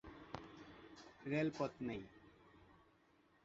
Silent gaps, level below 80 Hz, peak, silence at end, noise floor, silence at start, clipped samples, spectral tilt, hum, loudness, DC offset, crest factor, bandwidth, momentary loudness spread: none; -72 dBFS; -26 dBFS; 0.65 s; -73 dBFS; 0.05 s; under 0.1%; -5.5 dB/octave; none; -45 LUFS; under 0.1%; 22 dB; 7.6 kHz; 25 LU